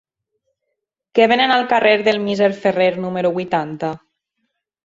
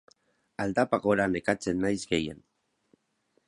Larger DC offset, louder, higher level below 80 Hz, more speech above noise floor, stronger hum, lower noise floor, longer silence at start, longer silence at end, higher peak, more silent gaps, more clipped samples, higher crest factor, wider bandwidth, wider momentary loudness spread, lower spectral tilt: neither; first, -17 LUFS vs -28 LUFS; about the same, -62 dBFS vs -58 dBFS; first, 61 dB vs 45 dB; neither; first, -77 dBFS vs -73 dBFS; first, 1.15 s vs 0.6 s; second, 0.9 s vs 1.1 s; first, -2 dBFS vs -8 dBFS; neither; neither; about the same, 18 dB vs 22 dB; second, 7.8 kHz vs 11.5 kHz; about the same, 11 LU vs 9 LU; about the same, -5.5 dB/octave vs -5.5 dB/octave